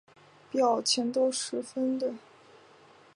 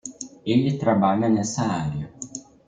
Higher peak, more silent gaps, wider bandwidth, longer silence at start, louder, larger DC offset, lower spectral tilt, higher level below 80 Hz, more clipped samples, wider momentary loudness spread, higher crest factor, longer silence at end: second, -14 dBFS vs -6 dBFS; neither; first, 11.5 kHz vs 9.4 kHz; first, 0.55 s vs 0.05 s; second, -29 LUFS vs -23 LUFS; neither; second, -2.5 dB/octave vs -6 dB/octave; second, -84 dBFS vs -56 dBFS; neither; second, 9 LU vs 16 LU; about the same, 18 dB vs 16 dB; first, 0.95 s vs 0.3 s